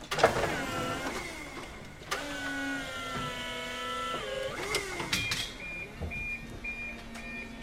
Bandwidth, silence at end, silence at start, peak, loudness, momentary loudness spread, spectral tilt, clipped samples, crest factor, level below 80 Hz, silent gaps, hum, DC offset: 16 kHz; 0 s; 0 s; -8 dBFS; -34 LUFS; 10 LU; -3 dB/octave; under 0.1%; 26 dB; -50 dBFS; none; none; under 0.1%